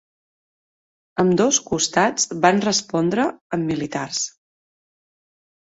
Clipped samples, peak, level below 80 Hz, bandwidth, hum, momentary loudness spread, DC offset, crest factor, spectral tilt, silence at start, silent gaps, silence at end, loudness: under 0.1%; -2 dBFS; -58 dBFS; 8 kHz; none; 8 LU; under 0.1%; 20 dB; -3.5 dB/octave; 1.15 s; 3.41-3.50 s; 1.4 s; -20 LUFS